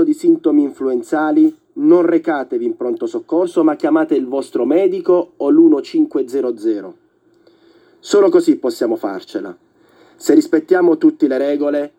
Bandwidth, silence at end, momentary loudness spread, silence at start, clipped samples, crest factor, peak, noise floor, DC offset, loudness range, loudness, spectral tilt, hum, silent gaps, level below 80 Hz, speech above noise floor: 14 kHz; 0.1 s; 9 LU; 0 s; under 0.1%; 16 dB; 0 dBFS; -53 dBFS; under 0.1%; 3 LU; -15 LUFS; -6 dB/octave; none; none; -74 dBFS; 38 dB